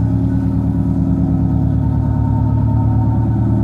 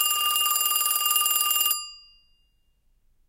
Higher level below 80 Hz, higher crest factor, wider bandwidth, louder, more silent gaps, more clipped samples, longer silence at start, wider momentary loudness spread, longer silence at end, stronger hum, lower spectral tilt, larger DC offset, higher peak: first, -22 dBFS vs -66 dBFS; second, 10 dB vs 20 dB; second, 2.3 kHz vs 17.5 kHz; first, -16 LUFS vs -21 LUFS; neither; neither; about the same, 0 s vs 0 s; second, 2 LU vs 5 LU; second, 0 s vs 1.3 s; neither; first, -11.5 dB/octave vs 5 dB/octave; neither; first, -4 dBFS vs -8 dBFS